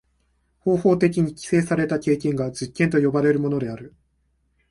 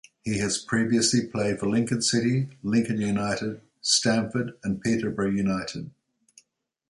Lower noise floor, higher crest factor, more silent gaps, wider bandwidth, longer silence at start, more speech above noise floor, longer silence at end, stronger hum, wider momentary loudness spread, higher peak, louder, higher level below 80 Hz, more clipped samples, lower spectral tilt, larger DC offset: about the same, -67 dBFS vs -70 dBFS; about the same, 18 dB vs 18 dB; neither; about the same, 11.5 kHz vs 11.5 kHz; first, 0.65 s vs 0.25 s; about the same, 47 dB vs 45 dB; second, 0.85 s vs 1 s; neither; about the same, 9 LU vs 9 LU; first, -4 dBFS vs -8 dBFS; first, -22 LUFS vs -25 LUFS; about the same, -54 dBFS vs -56 dBFS; neither; first, -7 dB/octave vs -4 dB/octave; neither